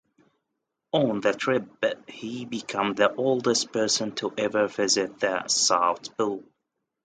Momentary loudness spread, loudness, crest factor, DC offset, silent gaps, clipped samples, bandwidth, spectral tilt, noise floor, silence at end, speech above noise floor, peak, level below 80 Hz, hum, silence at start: 10 LU; -25 LUFS; 20 dB; under 0.1%; none; under 0.1%; 9.6 kHz; -2.5 dB/octave; -82 dBFS; 0.6 s; 56 dB; -6 dBFS; -70 dBFS; none; 0.95 s